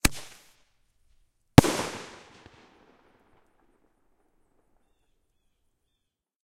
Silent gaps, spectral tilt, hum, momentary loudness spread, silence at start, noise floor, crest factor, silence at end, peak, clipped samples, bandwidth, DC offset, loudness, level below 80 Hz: none; -5 dB/octave; none; 25 LU; 0.05 s; -81 dBFS; 30 dB; 4.4 s; 0 dBFS; under 0.1%; 16 kHz; under 0.1%; -22 LUFS; -44 dBFS